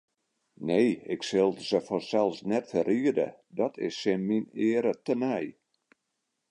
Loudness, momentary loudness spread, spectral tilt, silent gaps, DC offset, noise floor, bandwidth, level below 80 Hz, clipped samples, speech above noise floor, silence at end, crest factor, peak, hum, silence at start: -29 LUFS; 6 LU; -6 dB/octave; none; under 0.1%; -81 dBFS; 10.5 kHz; -72 dBFS; under 0.1%; 54 dB; 1 s; 18 dB; -12 dBFS; none; 0.6 s